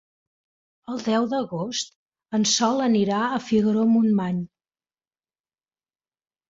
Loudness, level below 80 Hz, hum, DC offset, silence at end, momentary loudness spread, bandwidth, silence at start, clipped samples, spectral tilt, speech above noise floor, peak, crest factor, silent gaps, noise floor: -23 LUFS; -66 dBFS; none; under 0.1%; 2.05 s; 11 LU; 7.8 kHz; 0.9 s; under 0.1%; -4.5 dB/octave; over 68 dB; -8 dBFS; 16 dB; 1.96-2.06 s; under -90 dBFS